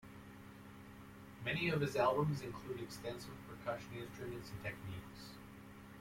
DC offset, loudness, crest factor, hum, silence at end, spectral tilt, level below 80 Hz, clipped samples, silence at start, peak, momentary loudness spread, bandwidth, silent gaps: under 0.1%; -41 LUFS; 22 dB; none; 0 s; -6 dB/octave; -66 dBFS; under 0.1%; 0 s; -20 dBFS; 21 LU; 16.5 kHz; none